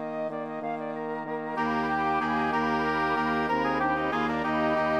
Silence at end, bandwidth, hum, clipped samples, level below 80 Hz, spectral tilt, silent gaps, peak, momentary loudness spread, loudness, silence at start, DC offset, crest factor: 0 s; 12 kHz; none; under 0.1%; -56 dBFS; -6.5 dB/octave; none; -16 dBFS; 7 LU; -28 LUFS; 0 s; under 0.1%; 12 dB